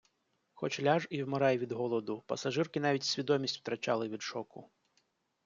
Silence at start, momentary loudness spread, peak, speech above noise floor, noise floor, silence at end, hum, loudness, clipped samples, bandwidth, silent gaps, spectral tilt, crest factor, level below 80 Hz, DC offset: 0.55 s; 9 LU; -14 dBFS; 45 dB; -78 dBFS; 0.8 s; none; -34 LUFS; under 0.1%; 7.6 kHz; none; -5 dB/octave; 20 dB; -78 dBFS; under 0.1%